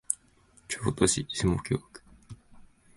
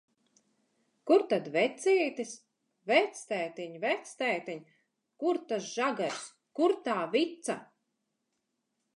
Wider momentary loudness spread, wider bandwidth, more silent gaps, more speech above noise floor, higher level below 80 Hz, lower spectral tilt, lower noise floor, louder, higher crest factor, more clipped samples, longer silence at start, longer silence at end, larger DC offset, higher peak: second, 10 LU vs 15 LU; about the same, 12 kHz vs 11.5 kHz; neither; second, 33 dB vs 52 dB; first, -48 dBFS vs -90 dBFS; about the same, -4 dB/octave vs -3.5 dB/octave; second, -61 dBFS vs -82 dBFS; about the same, -29 LUFS vs -31 LUFS; about the same, 26 dB vs 22 dB; neither; second, 0.1 s vs 1.05 s; second, 0.3 s vs 1.3 s; neither; first, -6 dBFS vs -12 dBFS